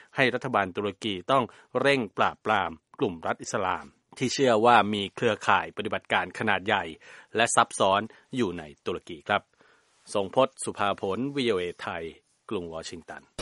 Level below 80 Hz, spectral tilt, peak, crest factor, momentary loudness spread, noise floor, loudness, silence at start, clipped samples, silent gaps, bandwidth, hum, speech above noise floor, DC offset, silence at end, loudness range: -64 dBFS; -4 dB/octave; -4 dBFS; 24 dB; 13 LU; -62 dBFS; -27 LUFS; 0.15 s; under 0.1%; none; 11.5 kHz; none; 35 dB; under 0.1%; 0 s; 5 LU